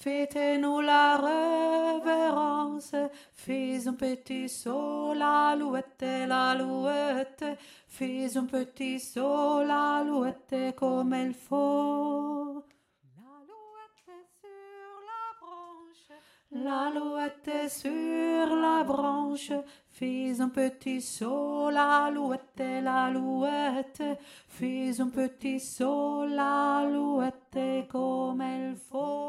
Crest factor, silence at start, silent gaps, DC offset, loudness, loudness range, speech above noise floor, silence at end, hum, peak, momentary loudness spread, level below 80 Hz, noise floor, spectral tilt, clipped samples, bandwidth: 20 dB; 0 s; none; under 0.1%; -30 LUFS; 8 LU; 31 dB; 0 s; none; -10 dBFS; 11 LU; -74 dBFS; -60 dBFS; -4 dB/octave; under 0.1%; 15 kHz